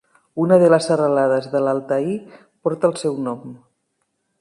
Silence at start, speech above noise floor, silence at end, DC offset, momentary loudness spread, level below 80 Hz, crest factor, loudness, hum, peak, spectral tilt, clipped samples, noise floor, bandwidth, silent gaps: 0.35 s; 54 dB; 0.85 s; under 0.1%; 15 LU; -68 dBFS; 18 dB; -19 LUFS; none; -2 dBFS; -6.5 dB/octave; under 0.1%; -72 dBFS; 11.5 kHz; none